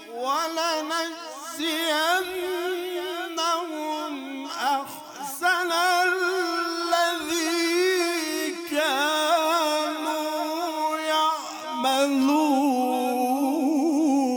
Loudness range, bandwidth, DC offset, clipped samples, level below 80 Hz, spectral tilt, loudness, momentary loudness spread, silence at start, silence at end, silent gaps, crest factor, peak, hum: 4 LU; over 20 kHz; under 0.1%; under 0.1%; -74 dBFS; -1 dB/octave; -24 LUFS; 8 LU; 0 s; 0 s; none; 16 dB; -10 dBFS; none